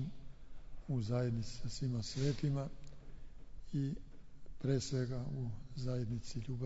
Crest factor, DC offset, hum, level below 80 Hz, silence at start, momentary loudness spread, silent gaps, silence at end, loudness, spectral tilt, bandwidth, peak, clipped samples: 16 dB; under 0.1%; none; -52 dBFS; 0 s; 23 LU; none; 0 s; -40 LUFS; -7.5 dB/octave; 7.6 kHz; -22 dBFS; under 0.1%